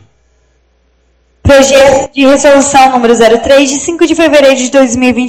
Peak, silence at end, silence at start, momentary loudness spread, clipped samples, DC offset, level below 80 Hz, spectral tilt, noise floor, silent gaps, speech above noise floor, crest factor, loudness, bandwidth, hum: 0 dBFS; 0 s; 1.45 s; 4 LU; 5%; under 0.1%; -32 dBFS; -3.5 dB/octave; -52 dBFS; none; 46 dB; 6 dB; -6 LUFS; 15 kHz; none